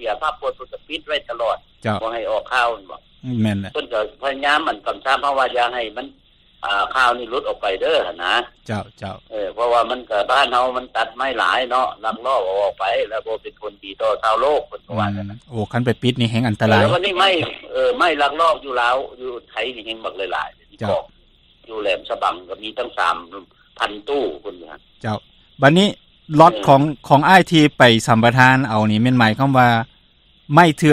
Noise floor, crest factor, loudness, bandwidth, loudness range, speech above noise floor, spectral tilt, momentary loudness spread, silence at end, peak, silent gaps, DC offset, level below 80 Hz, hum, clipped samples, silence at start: -54 dBFS; 18 dB; -18 LUFS; 14.5 kHz; 10 LU; 36 dB; -5.5 dB/octave; 16 LU; 0 s; 0 dBFS; none; under 0.1%; -52 dBFS; none; under 0.1%; 0 s